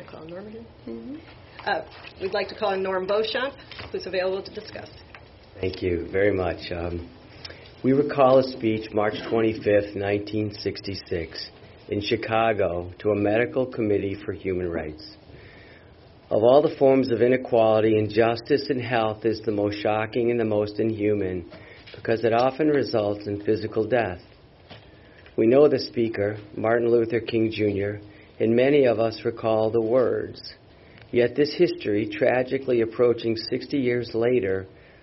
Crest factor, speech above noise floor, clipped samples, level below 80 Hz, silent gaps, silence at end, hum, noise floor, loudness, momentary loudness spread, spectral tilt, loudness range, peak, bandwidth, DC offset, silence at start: 18 dB; 27 dB; under 0.1%; -54 dBFS; none; 0.35 s; none; -50 dBFS; -24 LUFS; 18 LU; -5 dB/octave; 7 LU; -6 dBFS; 6 kHz; under 0.1%; 0 s